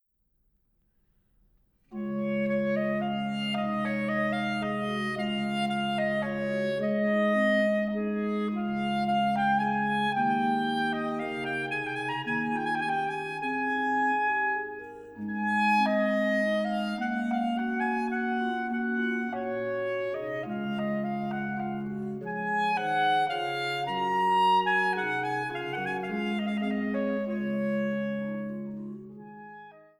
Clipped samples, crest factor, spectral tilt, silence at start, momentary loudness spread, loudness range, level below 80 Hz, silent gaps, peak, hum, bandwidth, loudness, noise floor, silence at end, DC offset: under 0.1%; 14 dB; -6.5 dB/octave; 1.9 s; 8 LU; 4 LU; -66 dBFS; none; -14 dBFS; none; 12 kHz; -29 LUFS; -72 dBFS; 0.2 s; under 0.1%